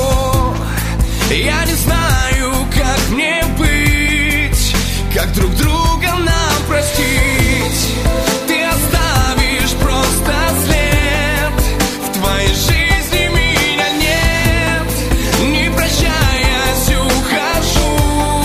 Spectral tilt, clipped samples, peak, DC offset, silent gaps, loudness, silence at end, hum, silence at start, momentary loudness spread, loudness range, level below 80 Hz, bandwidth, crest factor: -4 dB/octave; under 0.1%; 0 dBFS; under 0.1%; none; -14 LUFS; 0 s; none; 0 s; 3 LU; 1 LU; -18 dBFS; 15.5 kHz; 12 dB